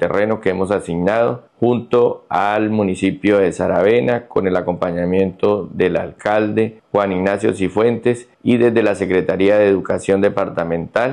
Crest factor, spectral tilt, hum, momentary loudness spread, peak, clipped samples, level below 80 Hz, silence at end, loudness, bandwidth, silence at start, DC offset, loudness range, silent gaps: 12 dB; -7 dB/octave; none; 6 LU; -4 dBFS; under 0.1%; -52 dBFS; 0 s; -17 LUFS; 11 kHz; 0 s; under 0.1%; 2 LU; none